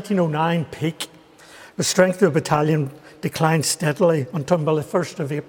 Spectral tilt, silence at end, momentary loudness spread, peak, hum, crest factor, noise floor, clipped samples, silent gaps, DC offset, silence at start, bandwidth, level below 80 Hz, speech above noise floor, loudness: -5 dB/octave; 0 s; 12 LU; -2 dBFS; none; 18 dB; -46 dBFS; under 0.1%; none; under 0.1%; 0 s; 18 kHz; -60 dBFS; 26 dB; -21 LUFS